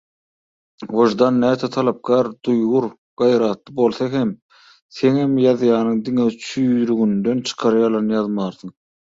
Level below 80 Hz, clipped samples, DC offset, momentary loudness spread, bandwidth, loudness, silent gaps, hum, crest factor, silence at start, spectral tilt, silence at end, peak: -60 dBFS; under 0.1%; under 0.1%; 9 LU; 7.8 kHz; -18 LUFS; 2.98-3.17 s, 4.42-4.49 s, 4.82-4.89 s; none; 16 dB; 0.8 s; -6.5 dB/octave; 0.3 s; -2 dBFS